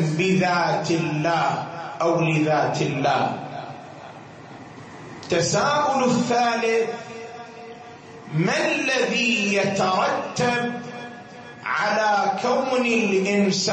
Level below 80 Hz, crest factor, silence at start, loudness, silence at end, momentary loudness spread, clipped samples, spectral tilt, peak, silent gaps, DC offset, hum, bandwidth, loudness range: -62 dBFS; 14 dB; 0 s; -21 LUFS; 0 s; 20 LU; under 0.1%; -4.5 dB/octave; -8 dBFS; none; under 0.1%; none; 8.8 kHz; 3 LU